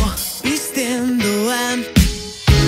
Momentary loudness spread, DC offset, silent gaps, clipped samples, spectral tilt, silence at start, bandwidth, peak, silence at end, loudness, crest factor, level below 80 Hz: 4 LU; under 0.1%; none; under 0.1%; -4.5 dB/octave; 0 s; 16.5 kHz; 0 dBFS; 0 s; -18 LUFS; 16 dB; -24 dBFS